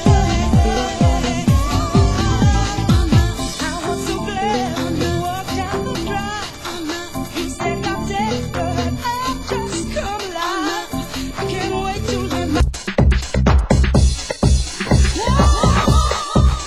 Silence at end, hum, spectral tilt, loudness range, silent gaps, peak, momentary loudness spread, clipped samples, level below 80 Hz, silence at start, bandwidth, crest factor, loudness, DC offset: 0 s; none; -5.5 dB/octave; 6 LU; none; 0 dBFS; 9 LU; under 0.1%; -22 dBFS; 0 s; 13 kHz; 16 dB; -18 LUFS; under 0.1%